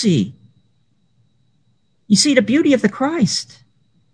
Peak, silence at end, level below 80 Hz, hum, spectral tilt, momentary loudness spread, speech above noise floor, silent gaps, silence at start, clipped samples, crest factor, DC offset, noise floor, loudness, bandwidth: 0 dBFS; 0.7 s; -60 dBFS; none; -4.5 dB/octave; 10 LU; 48 dB; none; 0 s; under 0.1%; 18 dB; under 0.1%; -64 dBFS; -16 LUFS; 10.5 kHz